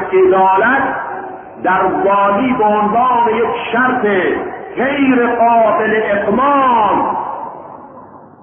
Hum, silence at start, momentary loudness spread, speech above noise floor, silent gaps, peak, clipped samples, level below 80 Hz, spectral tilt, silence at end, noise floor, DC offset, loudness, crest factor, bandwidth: none; 0 s; 13 LU; 24 dB; none; -2 dBFS; under 0.1%; -48 dBFS; -11 dB/octave; 0.15 s; -37 dBFS; under 0.1%; -13 LUFS; 12 dB; 3.6 kHz